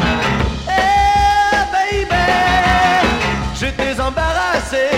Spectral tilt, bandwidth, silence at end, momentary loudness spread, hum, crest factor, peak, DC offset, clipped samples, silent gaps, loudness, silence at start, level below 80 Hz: -4.5 dB/octave; 16 kHz; 0 s; 6 LU; none; 14 dB; -2 dBFS; under 0.1%; under 0.1%; none; -15 LUFS; 0 s; -26 dBFS